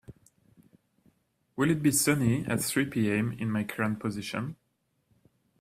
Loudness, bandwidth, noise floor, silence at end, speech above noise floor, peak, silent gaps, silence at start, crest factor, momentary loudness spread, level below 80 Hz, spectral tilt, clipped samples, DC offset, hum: -28 LUFS; 16 kHz; -75 dBFS; 1.05 s; 47 dB; -10 dBFS; none; 0.1 s; 20 dB; 11 LU; -62 dBFS; -5 dB/octave; under 0.1%; under 0.1%; none